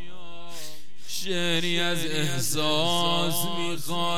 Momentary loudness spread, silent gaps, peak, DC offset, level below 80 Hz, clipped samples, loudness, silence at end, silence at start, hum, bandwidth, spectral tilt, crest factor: 19 LU; none; -12 dBFS; 5%; -62 dBFS; under 0.1%; -26 LUFS; 0 s; 0 s; none; 18.5 kHz; -3 dB/octave; 18 dB